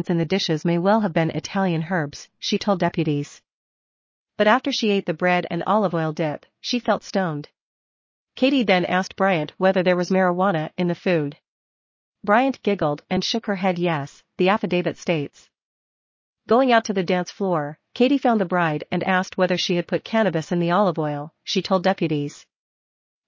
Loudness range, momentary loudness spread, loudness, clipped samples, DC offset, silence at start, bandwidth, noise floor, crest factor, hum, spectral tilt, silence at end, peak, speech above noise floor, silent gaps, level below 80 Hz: 3 LU; 8 LU; -22 LUFS; under 0.1%; under 0.1%; 0 s; 7.6 kHz; under -90 dBFS; 18 dB; none; -6 dB/octave; 0.85 s; -4 dBFS; over 69 dB; 3.53-4.25 s, 7.61-8.27 s, 11.48-12.13 s, 15.62-16.34 s; -64 dBFS